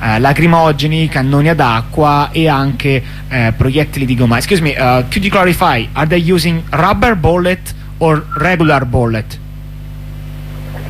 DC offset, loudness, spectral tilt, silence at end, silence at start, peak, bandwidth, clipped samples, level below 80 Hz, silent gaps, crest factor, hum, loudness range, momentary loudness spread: under 0.1%; -12 LUFS; -6.5 dB/octave; 0 s; 0 s; 0 dBFS; 15.5 kHz; under 0.1%; -28 dBFS; none; 12 dB; 50 Hz at -25 dBFS; 2 LU; 17 LU